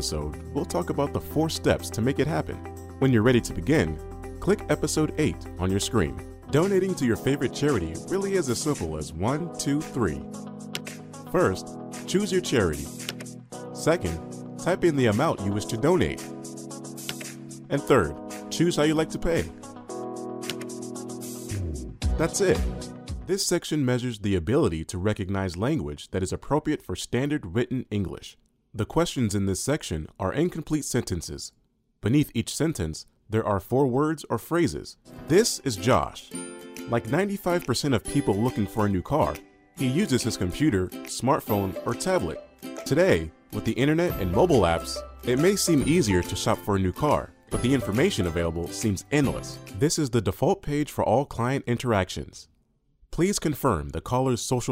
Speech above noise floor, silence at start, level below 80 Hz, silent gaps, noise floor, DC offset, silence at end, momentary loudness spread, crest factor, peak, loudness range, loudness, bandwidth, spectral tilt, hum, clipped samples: 42 dB; 0 s; -44 dBFS; none; -67 dBFS; under 0.1%; 0 s; 13 LU; 20 dB; -6 dBFS; 4 LU; -26 LUFS; 16 kHz; -5.5 dB/octave; none; under 0.1%